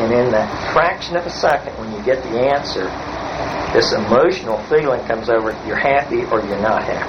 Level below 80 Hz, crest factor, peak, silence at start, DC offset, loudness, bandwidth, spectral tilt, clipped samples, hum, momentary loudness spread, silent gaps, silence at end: -42 dBFS; 16 dB; 0 dBFS; 0 s; under 0.1%; -18 LUFS; 6.6 kHz; -5 dB/octave; under 0.1%; none; 8 LU; none; 0 s